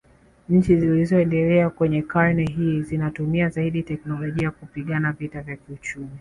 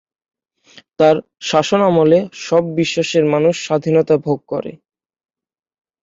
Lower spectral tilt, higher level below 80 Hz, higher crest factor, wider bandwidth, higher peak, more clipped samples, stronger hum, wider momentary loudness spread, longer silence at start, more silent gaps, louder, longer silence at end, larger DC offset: first, -8.5 dB/octave vs -5.5 dB/octave; first, -46 dBFS vs -58 dBFS; about the same, 18 dB vs 16 dB; first, 10.5 kHz vs 7.8 kHz; second, -4 dBFS vs 0 dBFS; neither; neither; first, 14 LU vs 8 LU; second, 0.5 s vs 1 s; neither; second, -22 LUFS vs -16 LUFS; second, 0 s vs 1.25 s; neither